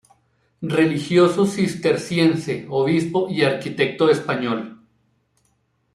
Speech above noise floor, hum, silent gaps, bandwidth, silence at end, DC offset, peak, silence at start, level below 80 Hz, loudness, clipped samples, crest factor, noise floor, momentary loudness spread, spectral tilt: 47 dB; none; none; 12.5 kHz; 1.2 s; under 0.1%; -4 dBFS; 0.6 s; -62 dBFS; -20 LUFS; under 0.1%; 16 dB; -66 dBFS; 8 LU; -6 dB/octave